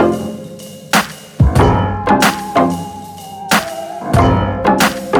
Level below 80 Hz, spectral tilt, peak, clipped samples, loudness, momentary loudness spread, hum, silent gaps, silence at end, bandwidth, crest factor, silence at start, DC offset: -26 dBFS; -5 dB/octave; 0 dBFS; under 0.1%; -14 LUFS; 17 LU; none; none; 0 s; over 20 kHz; 14 dB; 0 s; under 0.1%